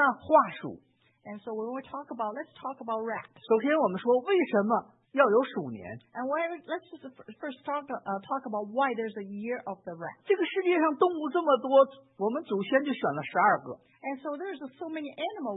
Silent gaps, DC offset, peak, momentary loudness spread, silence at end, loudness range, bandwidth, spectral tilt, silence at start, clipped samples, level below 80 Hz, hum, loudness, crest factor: none; under 0.1%; -8 dBFS; 16 LU; 0 s; 7 LU; 4 kHz; -9.5 dB/octave; 0 s; under 0.1%; -80 dBFS; none; -29 LUFS; 20 dB